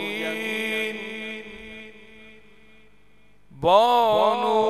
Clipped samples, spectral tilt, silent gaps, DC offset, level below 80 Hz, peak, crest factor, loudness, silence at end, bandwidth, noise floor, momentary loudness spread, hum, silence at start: under 0.1%; -4 dB/octave; none; 0.3%; -60 dBFS; -4 dBFS; 20 dB; -22 LUFS; 0 s; 14 kHz; -59 dBFS; 22 LU; 50 Hz at -60 dBFS; 0 s